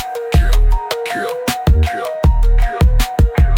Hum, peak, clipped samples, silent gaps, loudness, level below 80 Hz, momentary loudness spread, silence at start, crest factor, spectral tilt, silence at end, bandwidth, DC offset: none; -2 dBFS; under 0.1%; none; -16 LUFS; -14 dBFS; 5 LU; 0 s; 10 dB; -6 dB/octave; 0 s; 17 kHz; under 0.1%